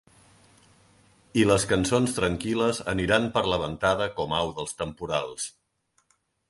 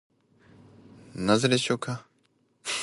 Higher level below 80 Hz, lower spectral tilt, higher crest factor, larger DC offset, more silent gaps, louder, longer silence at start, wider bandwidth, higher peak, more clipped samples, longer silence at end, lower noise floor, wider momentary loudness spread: first, -48 dBFS vs -62 dBFS; about the same, -4.5 dB/octave vs -4.5 dB/octave; about the same, 20 dB vs 22 dB; neither; neither; about the same, -26 LUFS vs -27 LUFS; first, 1.35 s vs 1.15 s; about the same, 11.5 kHz vs 11.5 kHz; about the same, -6 dBFS vs -8 dBFS; neither; first, 1 s vs 0 s; about the same, -71 dBFS vs -68 dBFS; second, 10 LU vs 16 LU